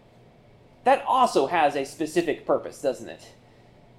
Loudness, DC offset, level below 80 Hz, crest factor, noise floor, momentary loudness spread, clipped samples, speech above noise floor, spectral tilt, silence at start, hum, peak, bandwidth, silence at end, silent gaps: -24 LUFS; under 0.1%; -62 dBFS; 18 dB; -54 dBFS; 12 LU; under 0.1%; 30 dB; -4.5 dB/octave; 0.85 s; none; -8 dBFS; 15 kHz; 0.8 s; none